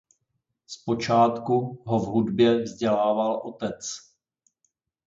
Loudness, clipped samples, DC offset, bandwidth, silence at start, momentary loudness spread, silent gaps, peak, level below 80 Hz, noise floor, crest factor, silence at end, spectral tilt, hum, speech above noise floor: -24 LUFS; under 0.1%; under 0.1%; 7.8 kHz; 0.7 s; 14 LU; none; -8 dBFS; -62 dBFS; -78 dBFS; 18 dB; 1.05 s; -6 dB/octave; none; 54 dB